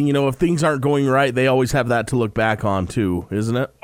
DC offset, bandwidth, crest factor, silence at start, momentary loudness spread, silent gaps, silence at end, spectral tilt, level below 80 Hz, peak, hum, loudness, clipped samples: under 0.1%; 16 kHz; 14 dB; 0 s; 5 LU; none; 0.15 s; -6.5 dB/octave; -42 dBFS; -4 dBFS; none; -19 LUFS; under 0.1%